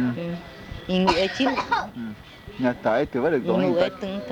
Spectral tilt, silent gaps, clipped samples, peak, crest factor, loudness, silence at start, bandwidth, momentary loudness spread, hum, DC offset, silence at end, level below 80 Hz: -6 dB/octave; none; under 0.1%; -4 dBFS; 20 dB; -24 LUFS; 0 s; 19 kHz; 16 LU; none; under 0.1%; 0 s; -48 dBFS